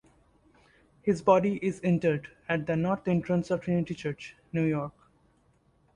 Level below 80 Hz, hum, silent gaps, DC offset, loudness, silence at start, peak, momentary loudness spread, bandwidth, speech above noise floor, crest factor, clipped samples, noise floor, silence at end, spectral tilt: -60 dBFS; none; none; under 0.1%; -29 LUFS; 1.05 s; -8 dBFS; 11 LU; 10 kHz; 39 dB; 20 dB; under 0.1%; -66 dBFS; 1.05 s; -8 dB/octave